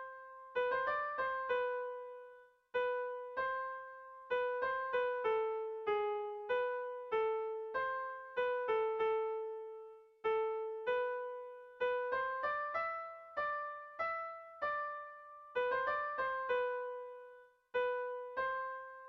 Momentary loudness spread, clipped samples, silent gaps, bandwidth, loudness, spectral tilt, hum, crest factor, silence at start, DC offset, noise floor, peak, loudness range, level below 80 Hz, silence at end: 12 LU; under 0.1%; none; 6 kHz; -38 LUFS; 0.5 dB/octave; none; 14 dB; 0 s; under 0.1%; -60 dBFS; -24 dBFS; 2 LU; -76 dBFS; 0 s